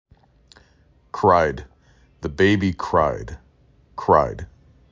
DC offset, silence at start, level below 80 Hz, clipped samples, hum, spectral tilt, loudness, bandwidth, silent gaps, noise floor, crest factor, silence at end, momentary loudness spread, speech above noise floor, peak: under 0.1%; 1.15 s; -40 dBFS; under 0.1%; none; -7 dB/octave; -20 LUFS; 7.6 kHz; none; -57 dBFS; 20 dB; 0.45 s; 21 LU; 38 dB; -2 dBFS